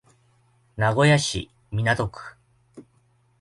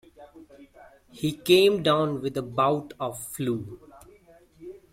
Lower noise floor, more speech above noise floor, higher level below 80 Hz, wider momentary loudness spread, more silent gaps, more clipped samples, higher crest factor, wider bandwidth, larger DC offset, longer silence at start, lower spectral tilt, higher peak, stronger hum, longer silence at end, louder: first, -63 dBFS vs -55 dBFS; first, 41 dB vs 30 dB; first, -50 dBFS vs -60 dBFS; second, 23 LU vs 26 LU; neither; neither; about the same, 20 dB vs 22 dB; second, 11.5 kHz vs 16.5 kHz; neither; first, 0.75 s vs 0.2 s; about the same, -5 dB/octave vs -5 dB/octave; about the same, -6 dBFS vs -6 dBFS; neither; first, 0.6 s vs 0.15 s; about the same, -23 LUFS vs -25 LUFS